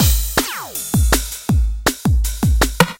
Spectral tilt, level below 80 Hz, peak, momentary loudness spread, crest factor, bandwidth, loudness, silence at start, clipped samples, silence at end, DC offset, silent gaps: -4 dB/octave; -20 dBFS; 0 dBFS; 5 LU; 16 dB; 17 kHz; -18 LUFS; 0 s; under 0.1%; 0.05 s; under 0.1%; none